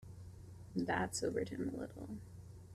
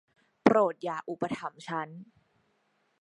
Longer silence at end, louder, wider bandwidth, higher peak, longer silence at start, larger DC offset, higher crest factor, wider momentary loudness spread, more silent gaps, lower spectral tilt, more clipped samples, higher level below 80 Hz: second, 0 s vs 0.95 s; second, -41 LUFS vs -30 LUFS; first, 14.5 kHz vs 11 kHz; second, -24 dBFS vs -4 dBFS; second, 0 s vs 0.45 s; neither; second, 18 dB vs 28 dB; first, 18 LU vs 15 LU; neither; second, -5 dB/octave vs -6.5 dB/octave; neither; first, -62 dBFS vs -72 dBFS